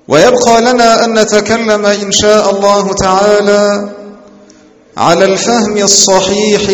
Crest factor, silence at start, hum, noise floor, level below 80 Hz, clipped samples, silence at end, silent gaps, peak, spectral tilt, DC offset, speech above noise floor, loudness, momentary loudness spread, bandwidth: 8 dB; 0.1 s; none; -40 dBFS; -40 dBFS; 1%; 0 s; none; 0 dBFS; -3 dB/octave; under 0.1%; 32 dB; -8 LUFS; 5 LU; over 20 kHz